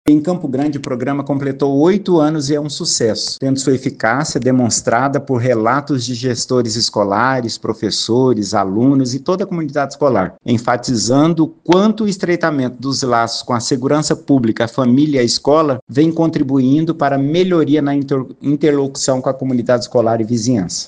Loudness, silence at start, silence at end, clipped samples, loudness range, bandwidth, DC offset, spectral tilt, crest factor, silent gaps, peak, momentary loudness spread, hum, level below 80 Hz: -15 LUFS; 0.05 s; 0 s; under 0.1%; 2 LU; 10 kHz; under 0.1%; -5 dB/octave; 14 dB; 15.82-15.87 s; 0 dBFS; 6 LU; none; -52 dBFS